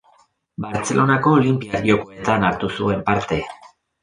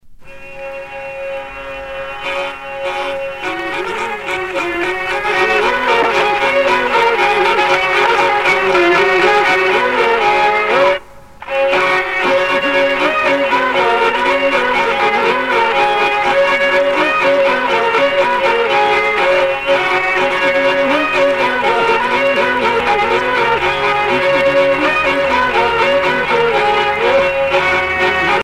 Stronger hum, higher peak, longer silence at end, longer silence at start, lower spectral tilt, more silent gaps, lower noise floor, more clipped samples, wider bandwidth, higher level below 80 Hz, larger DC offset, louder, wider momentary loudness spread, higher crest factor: neither; about the same, -2 dBFS vs -2 dBFS; first, 0.35 s vs 0 s; first, 0.6 s vs 0.05 s; first, -6 dB/octave vs -3.5 dB/octave; neither; first, -57 dBFS vs -35 dBFS; neither; second, 10.5 kHz vs 15 kHz; about the same, -46 dBFS vs -44 dBFS; neither; second, -19 LUFS vs -13 LUFS; about the same, 11 LU vs 9 LU; first, 18 dB vs 12 dB